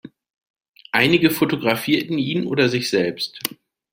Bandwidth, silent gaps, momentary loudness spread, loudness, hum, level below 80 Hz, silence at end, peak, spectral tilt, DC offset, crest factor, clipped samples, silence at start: 16.5 kHz; 0.30-0.34 s, 0.50-0.54 s, 0.68-0.74 s; 9 LU; -20 LUFS; none; -60 dBFS; 0.45 s; -2 dBFS; -5 dB/octave; under 0.1%; 20 dB; under 0.1%; 0.05 s